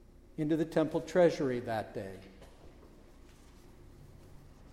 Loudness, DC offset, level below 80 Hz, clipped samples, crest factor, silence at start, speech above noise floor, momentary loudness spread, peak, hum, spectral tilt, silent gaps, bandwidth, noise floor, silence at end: -32 LUFS; under 0.1%; -58 dBFS; under 0.1%; 22 dB; 0.4 s; 24 dB; 21 LU; -14 dBFS; none; -7 dB/octave; none; 14 kHz; -56 dBFS; 0.05 s